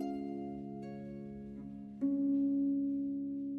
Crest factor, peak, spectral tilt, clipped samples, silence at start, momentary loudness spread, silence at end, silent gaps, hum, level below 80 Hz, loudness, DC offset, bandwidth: 12 dB; -24 dBFS; -10 dB/octave; under 0.1%; 0 s; 14 LU; 0 s; none; none; -66 dBFS; -37 LUFS; under 0.1%; 4.5 kHz